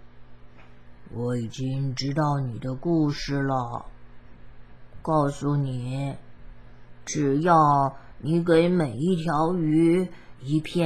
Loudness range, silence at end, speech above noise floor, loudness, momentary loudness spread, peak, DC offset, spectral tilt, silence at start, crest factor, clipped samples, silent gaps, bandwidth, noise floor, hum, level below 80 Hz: 7 LU; 0 s; 25 dB; -25 LUFS; 14 LU; -6 dBFS; 0.5%; -7 dB/octave; 0.05 s; 18 dB; under 0.1%; none; 11.5 kHz; -49 dBFS; none; -50 dBFS